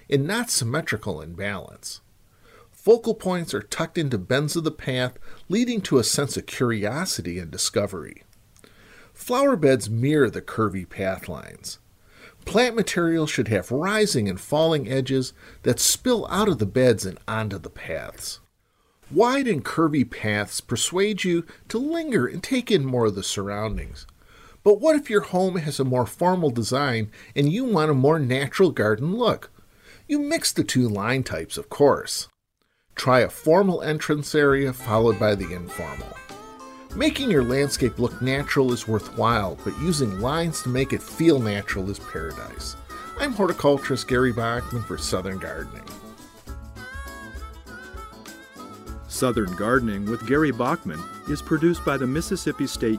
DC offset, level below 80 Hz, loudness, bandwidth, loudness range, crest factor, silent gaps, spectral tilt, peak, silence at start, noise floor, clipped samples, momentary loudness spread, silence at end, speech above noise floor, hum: under 0.1%; -46 dBFS; -23 LUFS; 16 kHz; 4 LU; 18 dB; none; -5 dB/octave; -6 dBFS; 0.1 s; -71 dBFS; under 0.1%; 17 LU; 0 s; 48 dB; none